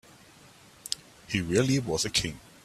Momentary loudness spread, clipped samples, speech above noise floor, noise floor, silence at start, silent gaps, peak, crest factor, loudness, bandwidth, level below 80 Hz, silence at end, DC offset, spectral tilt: 11 LU; under 0.1%; 27 dB; -54 dBFS; 0.85 s; none; -6 dBFS; 24 dB; -28 LUFS; 15 kHz; -54 dBFS; 0.25 s; under 0.1%; -4 dB/octave